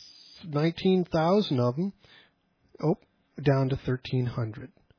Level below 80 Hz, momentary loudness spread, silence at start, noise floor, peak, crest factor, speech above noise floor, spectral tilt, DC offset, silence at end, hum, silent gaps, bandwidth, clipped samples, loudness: -56 dBFS; 11 LU; 0 s; -68 dBFS; -12 dBFS; 16 dB; 41 dB; -8.5 dB/octave; under 0.1%; 0.3 s; none; none; 5.4 kHz; under 0.1%; -28 LUFS